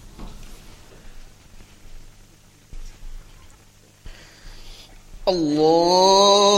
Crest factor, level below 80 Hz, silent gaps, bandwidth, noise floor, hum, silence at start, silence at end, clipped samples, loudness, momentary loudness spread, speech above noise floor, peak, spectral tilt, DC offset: 20 dB; -42 dBFS; none; 14.5 kHz; -51 dBFS; 50 Hz at -55 dBFS; 0.05 s; 0 s; under 0.1%; -16 LUFS; 29 LU; 36 dB; -2 dBFS; -3.5 dB/octave; under 0.1%